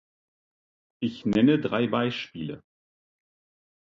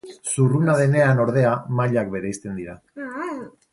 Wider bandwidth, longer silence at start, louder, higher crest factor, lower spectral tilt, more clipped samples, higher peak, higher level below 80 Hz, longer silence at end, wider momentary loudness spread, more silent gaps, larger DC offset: second, 7.4 kHz vs 11.5 kHz; first, 1 s vs 0.05 s; second, -25 LUFS vs -21 LUFS; about the same, 20 dB vs 16 dB; about the same, -7.5 dB/octave vs -7 dB/octave; neither; second, -10 dBFS vs -6 dBFS; second, -64 dBFS vs -56 dBFS; first, 1.4 s vs 0.25 s; about the same, 16 LU vs 16 LU; neither; neither